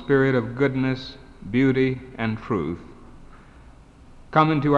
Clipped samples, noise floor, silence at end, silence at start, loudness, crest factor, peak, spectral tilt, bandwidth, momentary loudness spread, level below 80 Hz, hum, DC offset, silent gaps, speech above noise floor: under 0.1%; -47 dBFS; 0 s; 0 s; -23 LUFS; 20 dB; -4 dBFS; -8.5 dB/octave; 7.4 kHz; 12 LU; -48 dBFS; none; under 0.1%; none; 26 dB